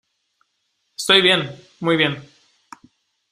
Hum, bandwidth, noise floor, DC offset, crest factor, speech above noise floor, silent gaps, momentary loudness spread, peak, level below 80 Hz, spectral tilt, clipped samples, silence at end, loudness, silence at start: none; 15 kHz; -71 dBFS; under 0.1%; 22 dB; 54 dB; none; 20 LU; 0 dBFS; -64 dBFS; -3.5 dB/octave; under 0.1%; 1.1 s; -17 LUFS; 1 s